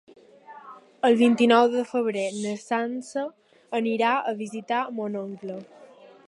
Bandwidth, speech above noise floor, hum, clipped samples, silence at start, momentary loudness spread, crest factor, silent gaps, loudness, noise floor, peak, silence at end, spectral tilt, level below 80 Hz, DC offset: 11.5 kHz; 24 dB; none; under 0.1%; 0.5 s; 18 LU; 20 dB; none; -24 LUFS; -48 dBFS; -6 dBFS; 0.45 s; -5 dB/octave; -80 dBFS; under 0.1%